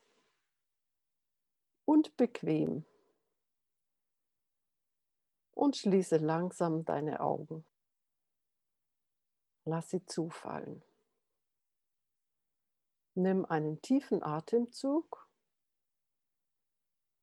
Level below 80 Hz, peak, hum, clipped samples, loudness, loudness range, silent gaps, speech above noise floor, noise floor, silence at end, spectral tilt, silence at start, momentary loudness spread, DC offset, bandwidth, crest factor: -86 dBFS; -16 dBFS; none; under 0.1%; -34 LUFS; 9 LU; none; 56 dB; -89 dBFS; 2.2 s; -7 dB/octave; 1.9 s; 16 LU; under 0.1%; 12 kHz; 20 dB